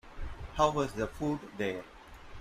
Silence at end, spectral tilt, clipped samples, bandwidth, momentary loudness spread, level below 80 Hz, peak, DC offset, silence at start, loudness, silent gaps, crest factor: 0 s; -5.5 dB/octave; under 0.1%; 15.5 kHz; 22 LU; -48 dBFS; -14 dBFS; under 0.1%; 0.05 s; -33 LUFS; none; 22 dB